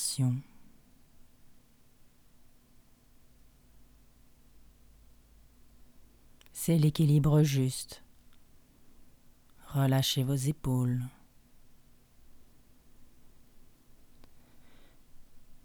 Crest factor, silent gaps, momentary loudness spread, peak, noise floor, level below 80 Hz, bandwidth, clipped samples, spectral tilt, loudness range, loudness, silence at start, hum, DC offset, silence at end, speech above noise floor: 20 dB; none; 15 LU; -14 dBFS; -60 dBFS; -56 dBFS; 19 kHz; under 0.1%; -6 dB/octave; 9 LU; -29 LUFS; 0 s; none; under 0.1%; 0.05 s; 33 dB